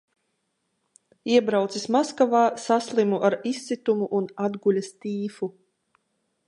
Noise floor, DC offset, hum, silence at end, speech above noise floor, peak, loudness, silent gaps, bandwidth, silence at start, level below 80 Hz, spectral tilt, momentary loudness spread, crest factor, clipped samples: -75 dBFS; under 0.1%; none; 0.95 s; 52 dB; -6 dBFS; -24 LUFS; none; 11.5 kHz; 1.25 s; -78 dBFS; -5.5 dB/octave; 10 LU; 18 dB; under 0.1%